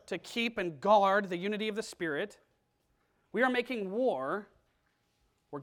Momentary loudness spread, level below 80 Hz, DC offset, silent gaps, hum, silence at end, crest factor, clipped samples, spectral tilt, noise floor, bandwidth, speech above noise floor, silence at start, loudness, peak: 12 LU; -72 dBFS; under 0.1%; none; none; 0 s; 20 dB; under 0.1%; -5 dB/octave; -75 dBFS; 16.5 kHz; 44 dB; 0.1 s; -31 LUFS; -14 dBFS